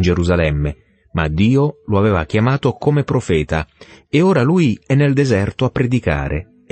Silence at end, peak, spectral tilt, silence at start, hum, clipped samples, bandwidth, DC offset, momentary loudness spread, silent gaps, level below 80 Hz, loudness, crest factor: 0.3 s; -2 dBFS; -7.5 dB/octave; 0 s; none; under 0.1%; 8.8 kHz; under 0.1%; 8 LU; none; -32 dBFS; -17 LUFS; 14 dB